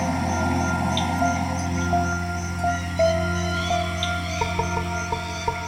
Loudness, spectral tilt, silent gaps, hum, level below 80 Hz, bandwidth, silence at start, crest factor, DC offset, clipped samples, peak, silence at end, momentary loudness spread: -24 LUFS; -5 dB/octave; none; none; -38 dBFS; 16 kHz; 0 s; 14 dB; under 0.1%; under 0.1%; -10 dBFS; 0 s; 5 LU